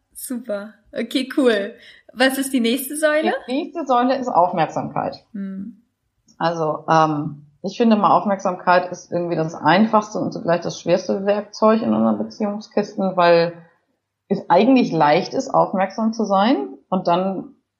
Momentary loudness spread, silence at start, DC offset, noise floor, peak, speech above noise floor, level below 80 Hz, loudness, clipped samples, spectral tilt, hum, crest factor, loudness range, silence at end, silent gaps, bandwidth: 13 LU; 0.15 s; under 0.1%; -72 dBFS; -2 dBFS; 53 dB; -68 dBFS; -19 LUFS; under 0.1%; -5.5 dB/octave; none; 18 dB; 4 LU; 0.3 s; none; 15 kHz